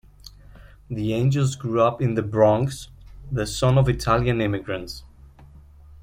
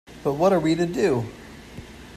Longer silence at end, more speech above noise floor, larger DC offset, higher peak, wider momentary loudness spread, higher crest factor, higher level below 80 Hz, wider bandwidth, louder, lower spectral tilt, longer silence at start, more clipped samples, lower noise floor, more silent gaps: about the same, 0.05 s vs 0 s; first, 26 dB vs 20 dB; neither; about the same, -4 dBFS vs -6 dBFS; second, 15 LU vs 21 LU; about the same, 18 dB vs 18 dB; first, -42 dBFS vs -50 dBFS; first, 15.5 kHz vs 14 kHz; about the same, -22 LUFS vs -22 LUFS; about the same, -6.5 dB/octave vs -6.5 dB/octave; first, 0.25 s vs 0.1 s; neither; first, -47 dBFS vs -41 dBFS; neither